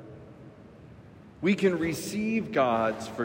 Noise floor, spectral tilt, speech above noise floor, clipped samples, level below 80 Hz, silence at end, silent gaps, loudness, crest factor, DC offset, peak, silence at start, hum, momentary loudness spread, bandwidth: -50 dBFS; -5.5 dB/octave; 23 dB; under 0.1%; -62 dBFS; 0 s; none; -27 LUFS; 16 dB; under 0.1%; -12 dBFS; 0 s; none; 23 LU; 16 kHz